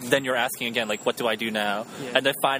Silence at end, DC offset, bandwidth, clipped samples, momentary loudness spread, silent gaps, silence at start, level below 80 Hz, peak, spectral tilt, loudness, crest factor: 0 s; under 0.1%; 15.5 kHz; under 0.1%; 4 LU; none; 0 s; -68 dBFS; -2 dBFS; -3 dB/octave; -25 LUFS; 24 dB